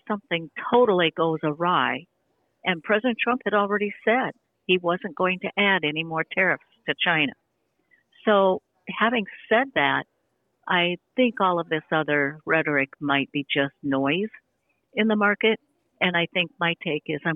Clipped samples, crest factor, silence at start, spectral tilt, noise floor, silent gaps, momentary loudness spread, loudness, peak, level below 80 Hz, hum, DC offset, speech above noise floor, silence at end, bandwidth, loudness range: under 0.1%; 18 dB; 0.05 s; -8.5 dB/octave; -73 dBFS; none; 8 LU; -23 LUFS; -8 dBFS; -70 dBFS; none; under 0.1%; 49 dB; 0 s; 4 kHz; 1 LU